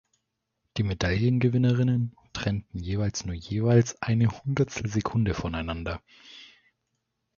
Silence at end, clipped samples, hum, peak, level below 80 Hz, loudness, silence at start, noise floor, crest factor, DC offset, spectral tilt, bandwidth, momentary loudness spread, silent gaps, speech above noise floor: 0.9 s; under 0.1%; none; -8 dBFS; -44 dBFS; -27 LUFS; 0.75 s; -80 dBFS; 20 dB; under 0.1%; -6.5 dB/octave; 7.2 kHz; 11 LU; none; 54 dB